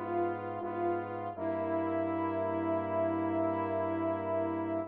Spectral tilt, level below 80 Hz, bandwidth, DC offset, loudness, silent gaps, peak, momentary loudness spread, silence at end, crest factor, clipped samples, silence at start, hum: -7 dB/octave; -80 dBFS; 4.1 kHz; under 0.1%; -34 LUFS; none; -20 dBFS; 4 LU; 0 s; 12 dB; under 0.1%; 0 s; none